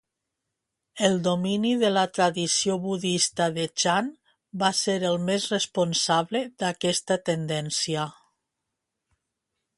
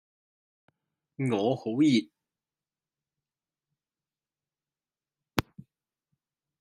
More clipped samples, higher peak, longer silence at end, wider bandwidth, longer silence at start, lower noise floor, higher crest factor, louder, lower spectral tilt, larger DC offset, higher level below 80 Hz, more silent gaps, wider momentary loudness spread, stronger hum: neither; about the same, -6 dBFS vs -4 dBFS; first, 1.65 s vs 1.2 s; second, 11.5 kHz vs 13.5 kHz; second, 0.95 s vs 1.2 s; second, -83 dBFS vs under -90 dBFS; second, 20 dB vs 30 dB; first, -25 LUFS vs -28 LUFS; second, -3.5 dB/octave vs -6 dB/octave; neither; about the same, -68 dBFS vs -66 dBFS; neither; second, 5 LU vs 10 LU; neither